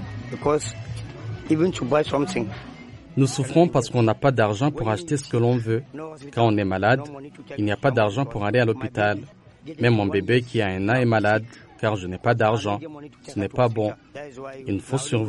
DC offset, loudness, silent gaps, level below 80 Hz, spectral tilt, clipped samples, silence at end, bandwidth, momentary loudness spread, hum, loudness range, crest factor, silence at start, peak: under 0.1%; -23 LUFS; none; -52 dBFS; -6.5 dB/octave; under 0.1%; 0 s; 11.5 kHz; 16 LU; none; 3 LU; 18 dB; 0 s; -4 dBFS